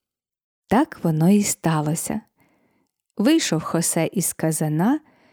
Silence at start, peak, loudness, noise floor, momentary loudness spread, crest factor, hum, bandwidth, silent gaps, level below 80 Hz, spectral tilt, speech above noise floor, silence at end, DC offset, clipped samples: 0.7 s; -6 dBFS; -21 LUFS; -69 dBFS; 8 LU; 16 dB; none; over 20 kHz; none; -58 dBFS; -5 dB/octave; 49 dB; 0.35 s; under 0.1%; under 0.1%